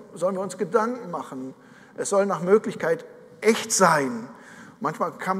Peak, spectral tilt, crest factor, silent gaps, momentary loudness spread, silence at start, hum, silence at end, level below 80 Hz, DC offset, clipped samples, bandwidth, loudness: -4 dBFS; -4 dB/octave; 22 dB; none; 17 LU; 0 s; none; 0 s; -78 dBFS; under 0.1%; under 0.1%; 15.5 kHz; -24 LUFS